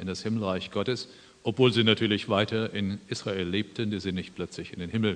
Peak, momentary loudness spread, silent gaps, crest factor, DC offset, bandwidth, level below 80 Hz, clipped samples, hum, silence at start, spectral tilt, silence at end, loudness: -8 dBFS; 13 LU; none; 20 dB; under 0.1%; 10 kHz; -62 dBFS; under 0.1%; none; 0 s; -5.5 dB/octave; 0 s; -28 LUFS